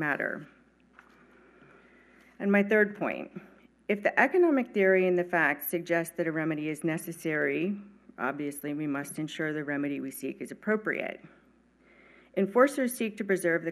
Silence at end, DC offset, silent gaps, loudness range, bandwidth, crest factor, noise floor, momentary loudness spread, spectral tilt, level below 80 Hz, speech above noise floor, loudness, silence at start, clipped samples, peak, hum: 0 s; under 0.1%; none; 7 LU; 13.5 kHz; 24 dB; -63 dBFS; 13 LU; -6 dB/octave; -74 dBFS; 34 dB; -29 LUFS; 0 s; under 0.1%; -6 dBFS; none